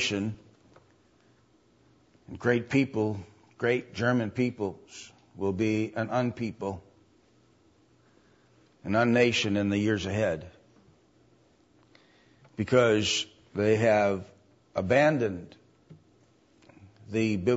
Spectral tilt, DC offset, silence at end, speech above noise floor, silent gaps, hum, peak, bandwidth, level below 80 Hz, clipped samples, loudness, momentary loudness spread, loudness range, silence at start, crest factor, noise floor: -5.5 dB/octave; under 0.1%; 0 s; 37 dB; none; none; -8 dBFS; 8 kHz; -64 dBFS; under 0.1%; -27 LUFS; 17 LU; 6 LU; 0 s; 20 dB; -64 dBFS